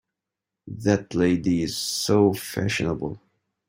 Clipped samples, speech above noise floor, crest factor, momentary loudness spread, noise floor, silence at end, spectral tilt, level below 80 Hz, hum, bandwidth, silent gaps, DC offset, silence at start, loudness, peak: under 0.1%; 63 dB; 18 dB; 12 LU; -86 dBFS; 0.5 s; -5 dB/octave; -54 dBFS; none; 16.5 kHz; none; under 0.1%; 0.65 s; -23 LUFS; -6 dBFS